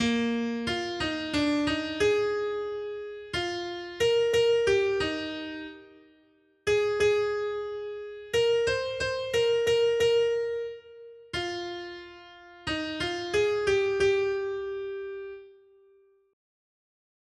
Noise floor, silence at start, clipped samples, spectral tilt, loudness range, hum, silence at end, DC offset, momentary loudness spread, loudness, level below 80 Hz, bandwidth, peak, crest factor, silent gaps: -64 dBFS; 0 s; under 0.1%; -4 dB/octave; 4 LU; none; 1.8 s; under 0.1%; 15 LU; -28 LUFS; -56 dBFS; 12.5 kHz; -14 dBFS; 16 dB; none